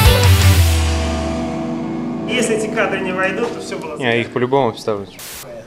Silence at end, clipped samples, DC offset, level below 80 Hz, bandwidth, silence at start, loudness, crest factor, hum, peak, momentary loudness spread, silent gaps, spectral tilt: 0 s; under 0.1%; under 0.1%; -26 dBFS; 16.5 kHz; 0 s; -17 LUFS; 16 dB; none; 0 dBFS; 14 LU; none; -5 dB/octave